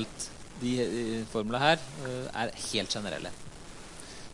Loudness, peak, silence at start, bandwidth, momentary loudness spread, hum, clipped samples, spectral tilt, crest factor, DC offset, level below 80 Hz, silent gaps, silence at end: -32 LUFS; -8 dBFS; 0 s; 11.5 kHz; 19 LU; none; under 0.1%; -4 dB/octave; 24 dB; under 0.1%; -54 dBFS; none; 0 s